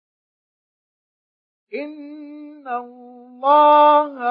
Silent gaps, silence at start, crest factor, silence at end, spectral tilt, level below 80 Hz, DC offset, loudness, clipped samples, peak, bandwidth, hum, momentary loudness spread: none; 1.75 s; 16 dB; 0 s; -6 dB/octave; under -90 dBFS; under 0.1%; -14 LUFS; under 0.1%; -4 dBFS; 5 kHz; none; 25 LU